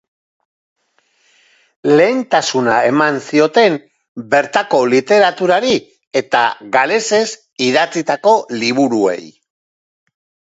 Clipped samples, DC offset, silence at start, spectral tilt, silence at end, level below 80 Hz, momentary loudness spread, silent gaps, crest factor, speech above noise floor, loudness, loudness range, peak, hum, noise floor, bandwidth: under 0.1%; under 0.1%; 1.85 s; -4 dB/octave; 1.15 s; -62 dBFS; 8 LU; 4.08-4.15 s, 6.07-6.11 s; 16 dB; 47 dB; -14 LUFS; 3 LU; 0 dBFS; none; -60 dBFS; 8 kHz